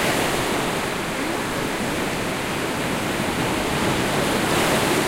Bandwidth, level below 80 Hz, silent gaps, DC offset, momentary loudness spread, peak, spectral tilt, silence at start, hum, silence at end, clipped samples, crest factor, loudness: 16 kHz; -42 dBFS; none; under 0.1%; 5 LU; -8 dBFS; -3.5 dB/octave; 0 s; none; 0 s; under 0.1%; 16 dB; -22 LUFS